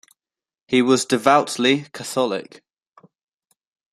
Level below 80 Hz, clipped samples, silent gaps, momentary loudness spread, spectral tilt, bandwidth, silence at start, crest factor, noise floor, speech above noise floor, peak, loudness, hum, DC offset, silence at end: -66 dBFS; under 0.1%; none; 8 LU; -4 dB/octave; 14 kHz; 0.7 s; 22 dB; under -90 dBFS; over 71 dB; 0 dBFS; -19 LUFS; none; under 0.1%; 1.5 s